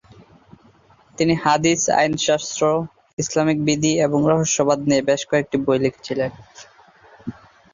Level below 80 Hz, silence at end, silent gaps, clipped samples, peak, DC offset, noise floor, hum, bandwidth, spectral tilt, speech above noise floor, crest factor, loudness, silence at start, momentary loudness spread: -54 dBFS; 0.4 s; 3.13-3.17 s; under 0.1%; -4 dBFS; under 0.1%; -53 dBFS; none; 7.6 kHz; -4.5 dB/octave; 34 dB; 18 dB; -19 LUFS; 1.2 s; 10 LU